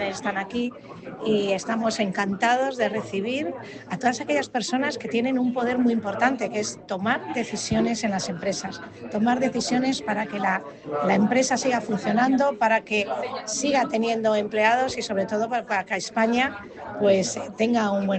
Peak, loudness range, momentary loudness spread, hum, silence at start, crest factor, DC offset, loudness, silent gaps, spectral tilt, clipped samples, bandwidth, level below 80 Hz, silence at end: -6 dBFS; 3 LU; 8 LU; none; 0 s; 18 dB; under 0.1%; -24 LUFS; none; -4 dB/octave; under 0.1%; 9 kHz; -60 dBFS; 0 s